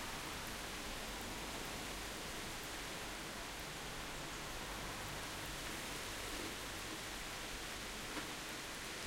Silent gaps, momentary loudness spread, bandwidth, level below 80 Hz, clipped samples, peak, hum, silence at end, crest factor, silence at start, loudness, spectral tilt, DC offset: none; 2 LU; 16.5 kHz; -56 dBFS; under 0.1%; -28 dBFS; none; 0 s; 16 dB; 0 s; -45 LUFS; -2 dB/octave; under 0.1%